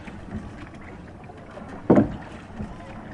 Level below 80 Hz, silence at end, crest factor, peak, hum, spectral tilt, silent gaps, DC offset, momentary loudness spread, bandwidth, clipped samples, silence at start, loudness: -46 dBFS; 0 s; 24 dB; -4 dBFS; none; -9 dB/octave; none; under 0.1%; 22 LU; 10.5 kHz; under 0.1%; 0 s; -25 LUFS